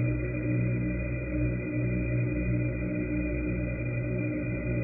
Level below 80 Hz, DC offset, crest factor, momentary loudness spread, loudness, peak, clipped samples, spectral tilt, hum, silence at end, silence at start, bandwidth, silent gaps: -38 dBFS; under 0.1%; 12 dB; 3 LU; -30 LUFS; -18 dBFS; under 0.1%; -13.5 dB/octave; 60 Hz at -40 dBFS; 0 s; 0 s; 2.7 kHz; none